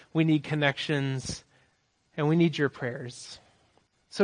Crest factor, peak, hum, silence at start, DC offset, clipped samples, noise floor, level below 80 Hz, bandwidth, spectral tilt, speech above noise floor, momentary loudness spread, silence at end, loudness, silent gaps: 20 dB; -8 dBFS; none; 0.15 s; under 0.1%; under 0.1%; -70 dBFS; -62 dBFS; 10.5 kHz; -6 dB/octave; 43 dB; 17 LU; 0 s; -28 LUFS; none